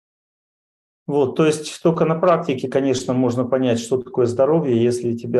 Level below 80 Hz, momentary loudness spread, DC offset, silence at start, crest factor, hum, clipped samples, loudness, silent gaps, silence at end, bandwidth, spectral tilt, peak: -62 dBFS; 5 LU; under 0.1%; 1.1 s; 14 dB; none; under 0.1%; -19 LUFS; none; 0 s; 12.5 kHz; -6.5 dB/octave; -4 dBFS